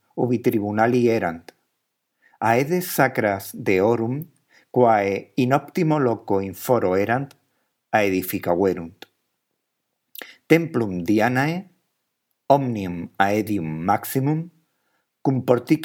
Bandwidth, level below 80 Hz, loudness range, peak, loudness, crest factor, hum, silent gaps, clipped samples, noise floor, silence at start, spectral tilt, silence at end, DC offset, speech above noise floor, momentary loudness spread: 18.5 kHz; -64 dBFS; 3 LU; 0 dBFS; -22 LUFS; 22 dB; none; none; under 0.1%; -77 dBFS; 0.15 s; -6.5 dB/octave; 0 s; under 0.1%; 57 dB; 11 LU